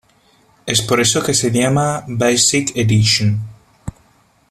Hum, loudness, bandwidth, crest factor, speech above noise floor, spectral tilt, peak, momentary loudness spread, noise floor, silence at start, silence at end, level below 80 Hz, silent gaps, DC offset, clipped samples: none; -15 LUFS; 14 kHz; 16 dB; 39 dB; -3.5 dB/octave; 0 dBFS; 21 LU; -54 dBFS; 0.65 s; 0.6 s; -46 dBFS; none; under 0.1%; under 0.1%